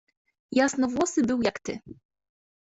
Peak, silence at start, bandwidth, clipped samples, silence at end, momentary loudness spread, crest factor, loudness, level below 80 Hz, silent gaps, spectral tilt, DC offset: -10 dBFS; 0.5 s; 8.2 kHz; under 0.1%; 0.85 s; 12 LU; 18 dB; -26 LUFS; -62 dBFS; none; -4 dB/octave; under 0.1%